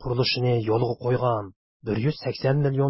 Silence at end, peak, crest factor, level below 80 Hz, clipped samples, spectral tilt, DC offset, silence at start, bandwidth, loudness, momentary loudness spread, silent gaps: 0 s; -10 dBFS; 14 dB; -52 dBFS; under 0.1%; -10.5 dB/octave; under 0.1%; 0 s; 5.8 kHz; -25 LUFS; 8 LU; 1.56-1.80 s